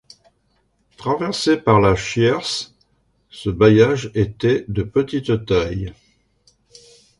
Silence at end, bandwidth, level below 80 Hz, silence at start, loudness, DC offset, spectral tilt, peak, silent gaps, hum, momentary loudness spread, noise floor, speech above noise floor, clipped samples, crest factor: 1.3 s; 11.5 kHz; -42 dBFS; 1 s; -18 LUFS; under 0.1%; -6 dB/octave; -2 dBFS; none; none; 13 LU; -64 dBFS; 47 dB; under 0.1%; 18 dB